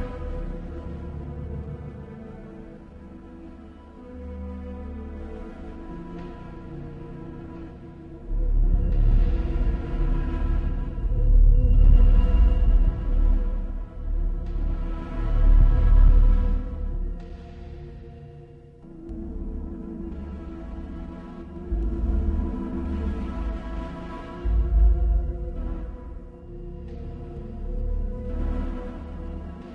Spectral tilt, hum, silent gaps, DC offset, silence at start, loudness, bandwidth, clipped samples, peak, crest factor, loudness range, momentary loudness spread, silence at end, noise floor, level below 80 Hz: -10 dB/octave; none; none; under 0.1%; 0 s; -27 LUFS; 3.2 kHz; under 0.1%; -4 dBFS; 18 dB; 16 LU; 21 LU; 0 s; -45 dBFS; -24 dBFS